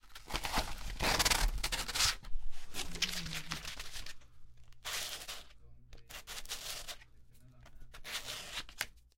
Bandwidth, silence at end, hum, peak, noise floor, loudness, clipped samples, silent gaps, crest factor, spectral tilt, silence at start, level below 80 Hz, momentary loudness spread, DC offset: 17 kHz; 0.15 s; none; -14 dBFS; -57 dBFS; -37 LUFS; under 0.1%; none; 24 dB; -1 dB/octave; 0.05 s; -44 dBFS; 19 LU; under 0.1%